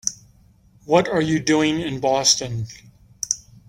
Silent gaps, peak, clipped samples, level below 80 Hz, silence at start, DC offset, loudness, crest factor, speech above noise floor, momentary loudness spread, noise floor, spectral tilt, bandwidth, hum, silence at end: none; -2 dBFS; under 0.1%; -52 dBFS; 0.05 s; under 0.1%; -20 LUFS; 20 dB; 34 dB; 13 LU; -54 dBFS; -3.5 dB/octave; 16.5 kHz; none; 0.3 s